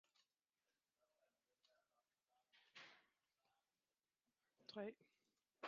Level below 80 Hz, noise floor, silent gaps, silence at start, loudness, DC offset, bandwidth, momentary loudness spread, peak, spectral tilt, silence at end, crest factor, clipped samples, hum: under -90 dBFS; under -90 dBFS; none; 2.55 s; -58 LUFS; under 0.1%; 7 kHz; 12 LU; -38 dBFS; -2.5 dB/octave; 0 s; 26 dB; under 0.1%; none